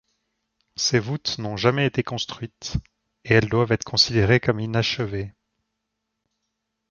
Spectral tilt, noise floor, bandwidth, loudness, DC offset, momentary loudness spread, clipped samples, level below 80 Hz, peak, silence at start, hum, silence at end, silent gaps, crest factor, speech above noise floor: -4.5 dB/octave; -80 dBFS; 7.2 kHz; -22 LUFS; under 0.1%; 13 LU; under 0.1%; -46 dBFS; -2 dBFS; 0.8 s; none; 1.6 s; none; 22 dB; 57 dB